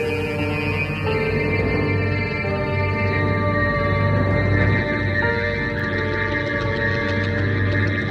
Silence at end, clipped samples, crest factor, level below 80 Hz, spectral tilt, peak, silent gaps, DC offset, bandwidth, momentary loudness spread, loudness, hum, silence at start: 0 s; under 0.1%; 14 dB; -36 dBFS; -7.5 dB/octave; -6 dBFS; none; under 0.1%; 6.6 kHz; 3 LU; -21 LUFS; none; 0 s